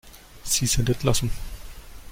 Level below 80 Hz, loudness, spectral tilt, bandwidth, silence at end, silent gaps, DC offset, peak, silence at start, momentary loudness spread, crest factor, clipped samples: -36 dBFS; -24 LUFS; -3.5 dB/octave; 16.5 kHz; 0 s; none; under 0.1%; -6 dBFS; 0.05 s; 22 LU; 20 dB; under 0.1%